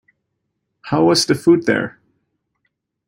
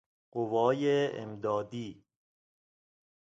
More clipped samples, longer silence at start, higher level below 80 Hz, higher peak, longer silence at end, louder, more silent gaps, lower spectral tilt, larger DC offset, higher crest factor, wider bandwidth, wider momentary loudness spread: neither; first, 0.85 s vs 0.35 s; first, -58 dBFS vs -74 dBFS; first, -2 dBFS vs -14 dBFS; second, 1.2 s vs 1.4 s; first, -16 LUFS vs -31 LUFS; neither; second, -4.5 dB/octave vs -6.5 dB/octave; neither; about the same, 18 dB vs 20 dB; first, 16 kHz vs 7.8 kHz; second, 8 LU vs 14 LU